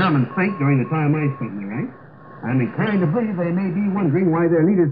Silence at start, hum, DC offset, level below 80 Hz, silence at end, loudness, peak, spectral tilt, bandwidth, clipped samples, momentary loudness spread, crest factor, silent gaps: 0 s; none; 0.2%; -66 dBFS; 0 s; -20 LUFS; -6 dBFS; -12 dB/octave; 5 kHz; under 0.1%; 11 LU; 12 dB; none